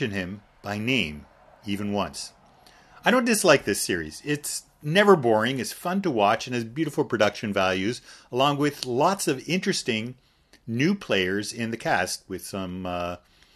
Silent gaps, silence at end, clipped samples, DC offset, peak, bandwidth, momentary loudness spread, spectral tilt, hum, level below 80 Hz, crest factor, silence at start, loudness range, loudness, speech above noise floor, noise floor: none; 0.4 s; under 0.1%; under 0.1%; -4 dBFS; 13.5 kHz; 14 LU; -4 dB/octave; none; -58 dBFS; 22 dB; 0 s; 5 LU; -25 LUFS; 30 dB; -54 dBFS